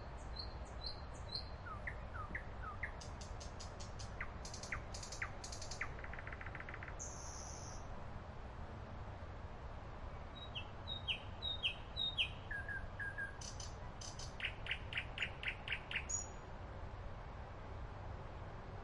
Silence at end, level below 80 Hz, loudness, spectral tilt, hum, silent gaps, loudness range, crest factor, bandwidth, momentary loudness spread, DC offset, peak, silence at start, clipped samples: 0 s; -52 dBFS; -46 LUFS; -2.5 dB/octave; none; none; 8 LU; 20 dB; 11.5 kHz; 11 LU; under 0.1%; -26 dBFS; 0 s; under 0.1%